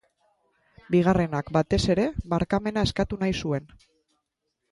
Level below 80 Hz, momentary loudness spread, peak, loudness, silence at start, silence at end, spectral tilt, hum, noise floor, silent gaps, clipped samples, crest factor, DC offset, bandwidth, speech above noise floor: -44 dBFS; 6 LU; -8 dBFS; -25 LUFS; 0.9 s; 1.05 s; -6.5 dB/octave; none; -80 dBFS; none; under 0.1%; 18 dB; under 0.1%; 11.5 kHz; 55 dB